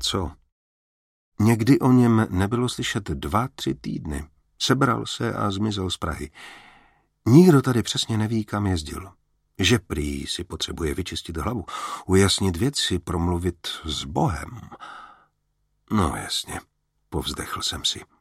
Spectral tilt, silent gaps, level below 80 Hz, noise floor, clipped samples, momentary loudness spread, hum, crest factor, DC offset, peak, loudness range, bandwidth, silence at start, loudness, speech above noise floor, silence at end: -5 dB/octave; 0.52-1.32 s; -42 dBFS; -71 dBFS; under 0.1%; 17 LU; none; 22 dB; under 0.1%; -2 dBFS; 7 LU; 16 kHz; 0 s; -23 LUFS; 49 dB; 0.15 s